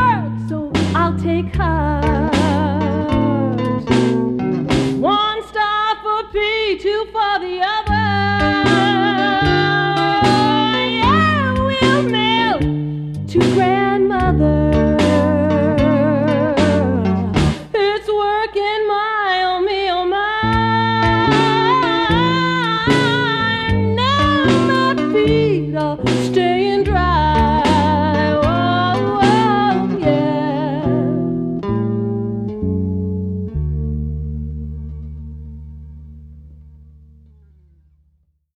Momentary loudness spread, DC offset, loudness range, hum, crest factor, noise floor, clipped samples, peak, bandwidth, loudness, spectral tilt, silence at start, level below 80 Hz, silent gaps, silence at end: 8 LU; under 0.1%; 7 LU; none; 14 dB; -60 dBFS; under 0.1%; -2 dBFS; 11.5 kHz; -16 LUFS; -6.5 dB/octave; 0 s; -32 dBFS; none; 1.75 s